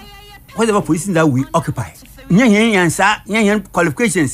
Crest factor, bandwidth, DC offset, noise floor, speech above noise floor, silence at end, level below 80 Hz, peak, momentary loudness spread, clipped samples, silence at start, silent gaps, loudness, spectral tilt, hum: 12 dB; 16 kHz; under 0.1%; -38 dBFS; 24 dB; 0 s; -44 dBFS; -2 dBFS; 10 LU; under 0.1%; 0 s; none; -14 LUFS; -5 dB/octave; none